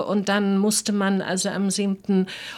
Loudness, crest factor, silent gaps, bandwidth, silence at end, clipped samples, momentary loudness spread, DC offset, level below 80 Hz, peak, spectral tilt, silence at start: -22 LUFS; 14 dB; none; 14 kHz; 0 s; under 0.1%; 3 LU; under 0.1%; -66 dBFS; -8 dBFS; -4.5 dB/octave; 0 s